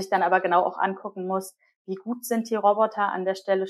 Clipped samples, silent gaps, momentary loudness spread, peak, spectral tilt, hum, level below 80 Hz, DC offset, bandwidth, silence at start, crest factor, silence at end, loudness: under 0.1%; 1.76-1.85 s; 12 LU; -6 dBFS; -5 dB/octave; none; under -90 dBFS; under 0.1%; 14.5 kHz; 0 s; 18 dB; 0 s; -25 LUFS